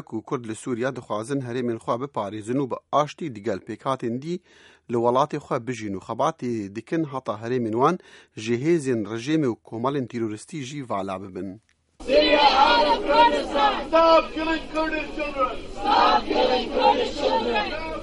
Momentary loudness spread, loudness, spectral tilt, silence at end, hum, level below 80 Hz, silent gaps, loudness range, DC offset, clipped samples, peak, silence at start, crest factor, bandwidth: 13 LU; -23 LUFS; -5 dB/octave; 0 s; none; -46 dBFS; none; 8 LU; under 0.1%; under 0.1%; -6 dBFS; 0.1 s; 18 dB; 11.5 kHz